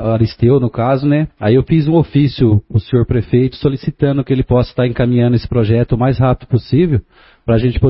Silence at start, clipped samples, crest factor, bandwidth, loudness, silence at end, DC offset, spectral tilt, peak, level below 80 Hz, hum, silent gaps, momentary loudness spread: 0 s; under 0.1%; 12 dB; 5.8 kHz; -14 LUFS; 0 s; under 0.1%; -13 dB/octave; 0 dBFS; -32 dBFS; none; none; 4 LU